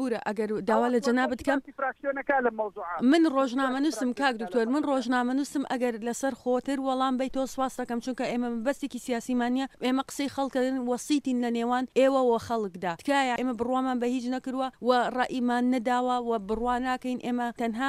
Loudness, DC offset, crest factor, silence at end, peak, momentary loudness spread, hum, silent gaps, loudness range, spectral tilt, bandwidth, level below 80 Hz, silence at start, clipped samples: -28 LUFS; under 0.1%; 18 dB; 0 s; -10 dBFS; 6 LU; none; none; 3 LU; -4.5 dB/octave; 14.5 kHz; -60 dBFS; 0 s; under 0.1%